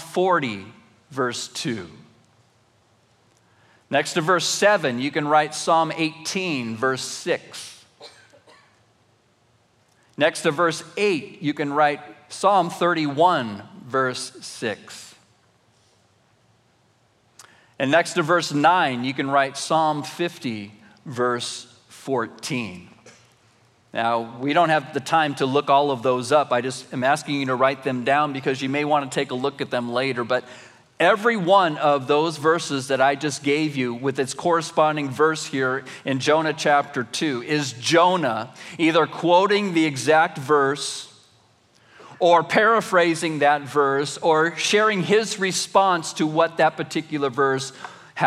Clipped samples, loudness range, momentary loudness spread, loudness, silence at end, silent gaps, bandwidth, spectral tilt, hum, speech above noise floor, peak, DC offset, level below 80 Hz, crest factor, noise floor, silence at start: under 0.1%; 9 LU; 11 LU; -21 LUFS; 0 s; none; 15 kHz; -4 dB/octave; none; 40 dB; -4 dBFS; under 0.1%; -78 dBFS; 18 dB; -61 dBFS; 0 s